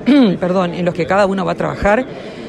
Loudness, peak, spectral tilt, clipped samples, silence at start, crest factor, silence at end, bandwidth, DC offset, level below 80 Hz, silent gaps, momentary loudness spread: -15 LUFS; -2 dBFS; -7 dB/octave; under 0.1%; 0 s; 12 dB; 0 s; 10.5 kHz; under 0.1%; -38 dBFS; none; 7 LU